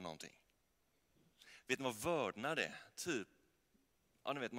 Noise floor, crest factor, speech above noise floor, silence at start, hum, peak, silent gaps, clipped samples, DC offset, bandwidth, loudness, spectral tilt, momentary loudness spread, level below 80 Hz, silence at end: -81 dBFS; 22 dB; 39 dB; 0 s; none; -22 dBFS; none; under 0.1%; under 0.1%; 16 kHz; -42 LUFS; -3.5 dB/octave; 17 LU; -78 dBFS; 0 s